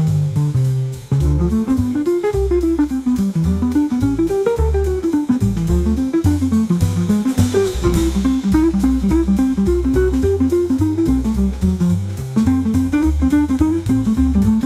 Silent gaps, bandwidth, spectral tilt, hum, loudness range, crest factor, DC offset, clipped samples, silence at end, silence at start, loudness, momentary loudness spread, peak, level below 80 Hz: none; 15.5 kHz; -8 dB/octave; none; 1 LU; 14 dB; under 0.1%; under 0.1%; 0 s; 0 s; -17 LUFS; 3 LU; -2 dBFS; -26 dBFS